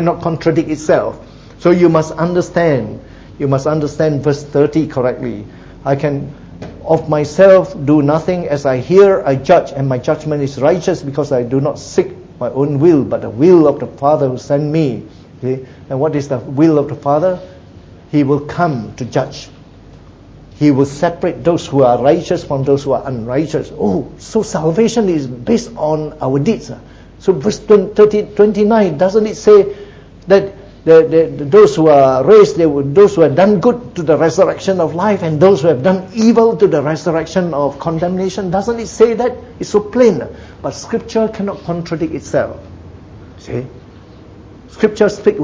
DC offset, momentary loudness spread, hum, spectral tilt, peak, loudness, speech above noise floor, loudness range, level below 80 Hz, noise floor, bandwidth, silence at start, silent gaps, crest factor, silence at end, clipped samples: under 0.1%; 13 LU; none; -7 dB/octave; 0 dBFS; -13 LUFS; 26 dB; 7 LU; -42 dBFS; -38 dBFS; 8 kHz; 0 s; none; 14 dB; 0 s; under 0.1%